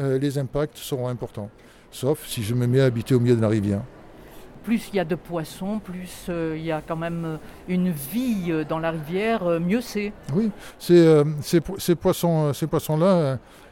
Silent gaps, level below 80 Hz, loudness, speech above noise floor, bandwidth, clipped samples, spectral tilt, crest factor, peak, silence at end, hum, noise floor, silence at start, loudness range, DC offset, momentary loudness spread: none; -50 dBFS; -23 LUFS; 21 dB; 17 kHz; under 0.1%; -7 dB/octave; 18 dB; -6 dBFS; 0.05 s; none; -43 dBFS; 0 s; 8 LU; under 0.1%; 12 LU